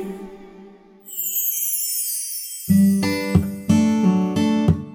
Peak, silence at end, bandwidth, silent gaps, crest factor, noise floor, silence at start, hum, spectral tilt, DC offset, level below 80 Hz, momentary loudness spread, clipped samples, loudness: -4 dBFS; 0 s; over 20 kHz; none; 18 dB; -45 dBFS; 0 s; none; -5 dB/octave; under 0.1%; -44 dBFS; 11 LU; under 0.1%; -19 LUFS